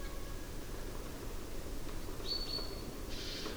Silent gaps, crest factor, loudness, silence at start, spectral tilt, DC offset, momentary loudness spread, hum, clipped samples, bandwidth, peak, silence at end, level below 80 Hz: none; 14 dB; -43 LUFS; 0 s; -3.5 dB/octave; under 0.1%; 8 LU; none; under 0.1%; over 20 kHz; -28 dBFS; 0 s; -44 dBFS